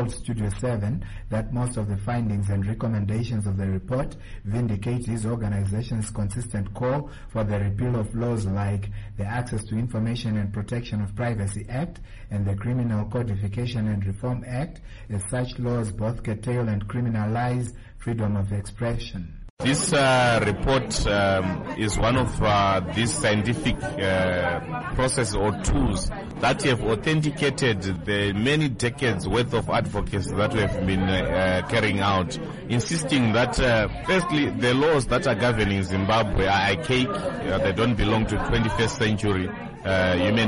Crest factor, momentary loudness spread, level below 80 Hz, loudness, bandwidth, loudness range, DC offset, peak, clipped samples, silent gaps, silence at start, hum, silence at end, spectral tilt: 12 dB; 8 LU; -38 dBFS; -25 LUFS; 11.5 kHz; 6 LU; under 0.1%; -12 dBFS; under 0.1%; 19.50-19.57 s; 0 s; none; 0 s; -5.5 dB/octave